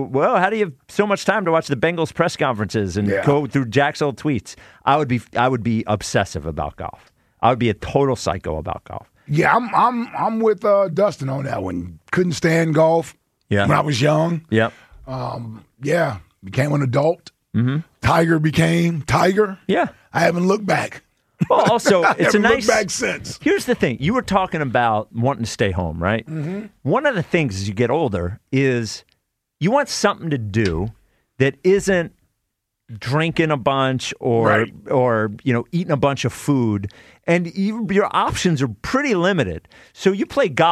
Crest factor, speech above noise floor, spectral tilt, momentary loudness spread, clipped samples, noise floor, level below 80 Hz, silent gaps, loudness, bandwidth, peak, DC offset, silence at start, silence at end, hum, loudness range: 16 dB; 57 dB; -6 dB/octave; 10 LU; under 0.1%; -76 dBFS; -46 dBFS; none; -19 LUFS; 14.5 kHz; -2 dBFS; under 0.1%; 0 s; 0 s; none; 4 LU